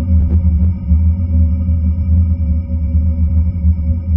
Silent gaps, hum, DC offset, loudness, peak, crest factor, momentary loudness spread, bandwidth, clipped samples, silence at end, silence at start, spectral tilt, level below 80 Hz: none; none; under 0.1%; -15 LUFS; -2 dBFS; 10 dB; 3 LU; 2.4 kHz; under 0.1%; 0 s; 0 s; -13.5 dB/octave; -16 dBFS